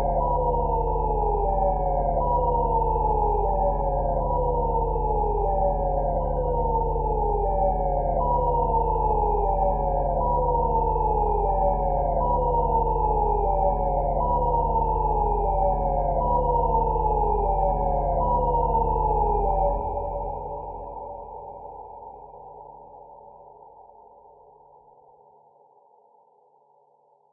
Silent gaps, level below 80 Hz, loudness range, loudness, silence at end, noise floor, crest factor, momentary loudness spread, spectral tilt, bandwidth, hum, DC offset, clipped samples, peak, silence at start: none; -30 dBFS; 8 LU; -24 LUFS; 3.5 s; -61 dBFS; 14 dB; 11 LU; -14 dB/octave; 2.8 kHz; none; under 0.1%; under 0.1%; -10 dBFS; 0 s